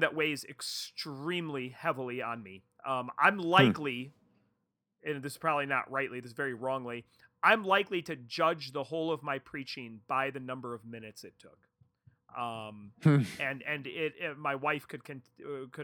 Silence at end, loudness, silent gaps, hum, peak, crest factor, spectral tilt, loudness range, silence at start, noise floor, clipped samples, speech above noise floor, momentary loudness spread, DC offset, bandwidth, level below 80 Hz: 0 s; -32 LUFS; none; none; -8 dBFS; 26 dB; -5.5 dB/octave; 7 LU; 0 s; -82 dBFS; under 0.1%; 49 dB; 17 LU; under 0.1%; 18.5 kHz; -76 dBFS